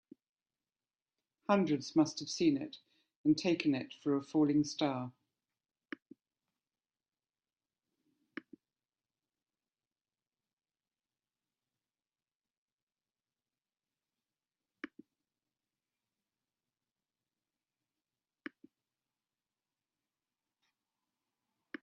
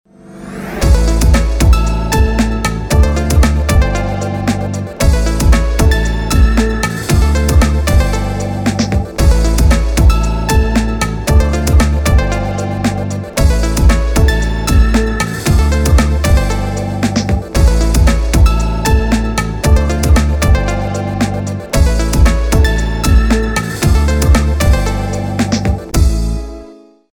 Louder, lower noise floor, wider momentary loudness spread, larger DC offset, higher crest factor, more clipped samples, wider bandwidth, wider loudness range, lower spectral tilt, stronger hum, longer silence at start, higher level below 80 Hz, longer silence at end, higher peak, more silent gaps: second, -33 LUFS vs -13 LUFS; first, under -90 dBFS vs -37 dBFS; first, 20 LU vs 6 LU; neither; first, 24 dB vs 12 dB; neither; second, 8.2 kHz vs 19 kHz; first, 26 LU vs 1 LU; about the same, -5.5 dB/octave vs -5.5 dB/octave; neither; first, 1.5 s vs 0.3 s; second, -82 dBFS vs -14 dBFS; first, 6.95 s vs 0.4 s; second, -16 dBFS vs 0 dBFS; first, 3.16-3.24 s, 6.02-6.06 s, 10.53-10.57 s, 12.35-12.40 s, 12.57-12.87 s vs none